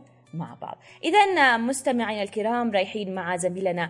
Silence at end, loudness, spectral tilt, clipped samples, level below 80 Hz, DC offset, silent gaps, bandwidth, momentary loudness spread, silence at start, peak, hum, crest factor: 0 s; -23 LUFS; -4 dB/octave; under 0.1%; -76 dBFS; under 0.1%; none; 11.5 kHz; 18 LU; 0.35 s; -6 dBFS; none; 18 dB